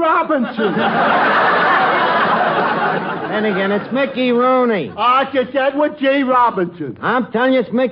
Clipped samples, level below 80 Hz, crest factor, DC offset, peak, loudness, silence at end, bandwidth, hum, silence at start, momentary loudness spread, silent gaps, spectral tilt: under 0.1%; -60 dBFS; 12 dB; under 0.1%; -4 dBFS; -15 LUFS; 0 s; 5.6 kHz; none; 0 s; 6 LU; none; -8 dB/octave